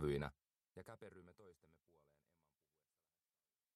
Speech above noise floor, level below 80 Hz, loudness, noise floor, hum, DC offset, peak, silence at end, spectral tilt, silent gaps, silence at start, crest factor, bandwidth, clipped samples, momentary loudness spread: over 36 dB; -66 dBFS; -50 LUFS; under -90 dBFS; none; under 0.1%; -28 dBFS; 2.25 s; -7.5 dB/octave; none; 0 s; 24 dB; 13.5 kHz; under 0.1%; 22 LU